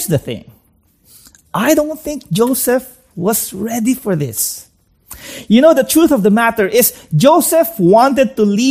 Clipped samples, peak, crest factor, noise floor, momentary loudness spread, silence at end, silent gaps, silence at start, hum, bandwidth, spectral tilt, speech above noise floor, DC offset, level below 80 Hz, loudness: under 0.1%; 0 dBFS; 14 dB; -54 dBFS; 15 LU; 0 s; none; 0 s; none; 15.5 kHz; -5 dB/octave; 42 dB; under 0.1%; -48 dBFS; -13 LUFS